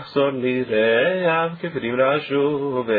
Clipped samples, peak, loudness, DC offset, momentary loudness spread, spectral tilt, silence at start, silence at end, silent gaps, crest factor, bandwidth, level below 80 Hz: under 0.1%; -8 dBFS; -20 LUFS; under 0.1%; 6 LU; -9 dB/octave; 0 s; 0 s; none; 12 dB; 4.9 kHz; -62 dBFS